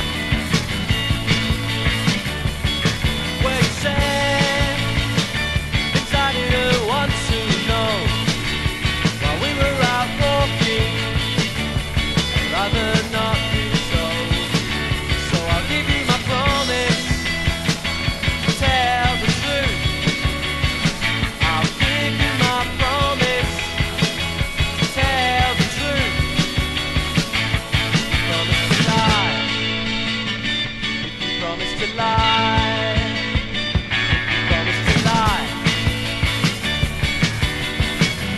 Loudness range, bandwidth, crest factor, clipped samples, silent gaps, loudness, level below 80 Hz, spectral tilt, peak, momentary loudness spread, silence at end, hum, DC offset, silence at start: 1 LU; 12.5 kHz; 18 dB; under 0.1%; none; -19 LUFS; -30 dBFS; -4 dB/octave; -2 dBFS; 4 LU; 0 s; none; under 0.1%; 0 s